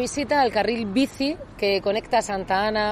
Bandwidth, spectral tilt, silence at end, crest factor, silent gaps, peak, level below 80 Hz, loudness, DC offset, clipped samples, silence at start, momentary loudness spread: 13.5 kHz; -4 dB/octave; 0 s; 14 dB; none; -10 dBFS; -48 dBFS; -23 LUFS; under 0.1%; under 0.1%; 0 s; 5 LU